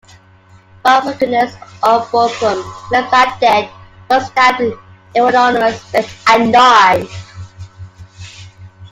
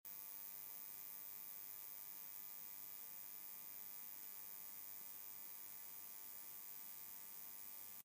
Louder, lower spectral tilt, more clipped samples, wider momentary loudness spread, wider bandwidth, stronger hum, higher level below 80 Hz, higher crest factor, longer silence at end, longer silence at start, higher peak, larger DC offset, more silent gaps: first, -12 LUFS vs -51 LUFS; first, -4 dB/octave vs 0 dB/octave; neither; first, 22 LU vs 1 LU; about the same, 16 kHz vs 15.5 kHz; neither; first, -50 dBFS vs under -90 dBFS; about the same, 14 dB vs 16 dB; about the same, 0.05 s vs 0 s; first, 0.85 s vs 0.05 s; first, 0 dBFS vs -38 dBFS; neither; neither